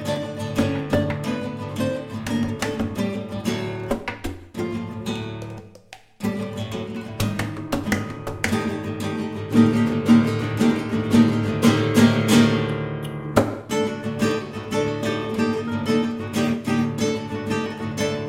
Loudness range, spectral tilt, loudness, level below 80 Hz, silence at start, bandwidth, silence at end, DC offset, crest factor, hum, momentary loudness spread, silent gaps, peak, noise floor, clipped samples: 10 LU; -6 dB/octave; -23 LUFS; -46 dBFS; 0 s; 16 kHz; 0 s; under 0.1%; 20 dB; none; 12 LU; none; -2 dBFS; -46 dBFS; under 0.1%